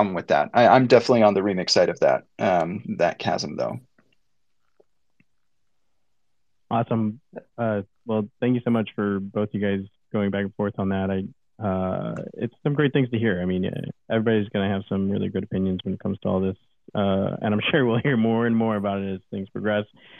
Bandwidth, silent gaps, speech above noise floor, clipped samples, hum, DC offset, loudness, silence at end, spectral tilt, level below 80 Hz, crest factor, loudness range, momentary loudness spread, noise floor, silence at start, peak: 8.8 kHz; none; 57 dB; under 0.1%; none; under 0.1%; -23 LUFS; 0.35 s; -6.5 dB/octave; -68 dBFS; 22 dB; 9 LU; 12 LU; -80 dBFS; 0 s; -2 dBFS